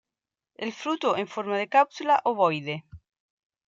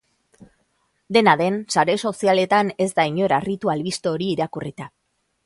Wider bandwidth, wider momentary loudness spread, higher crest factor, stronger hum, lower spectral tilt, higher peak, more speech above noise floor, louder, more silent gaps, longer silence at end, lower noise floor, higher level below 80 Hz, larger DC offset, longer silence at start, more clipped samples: second, 7.6 kHz vs 11.5 kHz; about the same, 13 LU vs 11 LU; about the same, 20 dB vs 20 dB; neither; about the same, -5 dB/octave vs -5 dB/octave; second, -8 dBFS vs -2 dBFS; first, 65 dB vs 48 dB; second, -26 LUFS vs -20 LUFS; neither; about the same, 0.7 s vs 0.6 s; first, -90 dBFS vs -68 dBFS; about the same, -66 dBFS vs -62 dBFS; neither; first, 0.6 s vs 0.4 s; neither